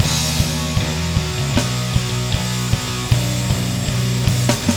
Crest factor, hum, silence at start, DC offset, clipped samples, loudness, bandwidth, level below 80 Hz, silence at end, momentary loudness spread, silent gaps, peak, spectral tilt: 18 dB; none; 0 s; under 0.1%; under 0.1%; -19 LUFS; 18.5 kHz; -30 dBFS; 0 s; 3 LU; none; 0 dBFS; -4.5 dB/octave